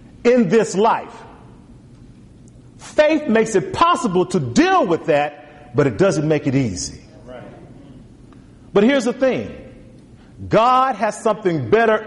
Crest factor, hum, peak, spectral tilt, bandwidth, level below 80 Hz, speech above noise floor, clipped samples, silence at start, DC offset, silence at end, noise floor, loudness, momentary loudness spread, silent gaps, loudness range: 14 dB; none; -4 dBFS; -5.5 dB/octave; 11.5 kHz; -48 dBFS; 27 dB; under 0.1%; 0.25 s; under 0.1%; 0 s; -44 dBFS; -17 LUFS; 13 LU; none; 5 LU